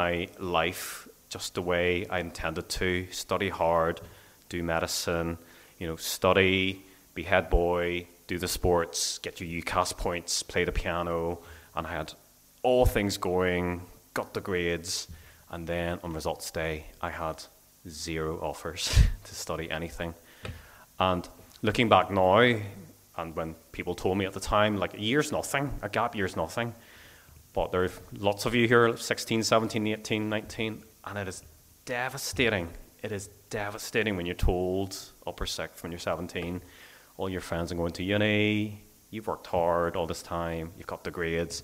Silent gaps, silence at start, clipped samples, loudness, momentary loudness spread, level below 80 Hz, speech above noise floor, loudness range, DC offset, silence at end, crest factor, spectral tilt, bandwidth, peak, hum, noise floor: none; 0 s; under 0.1%; -29 LUFS; 14 LU; -42 dBFS; 25 dB; 6 LU; under 0.1%; 0 s; 24 dB; -4.5 dB/octave; 16 kHz; -6 dBFS; none; -54 dBFS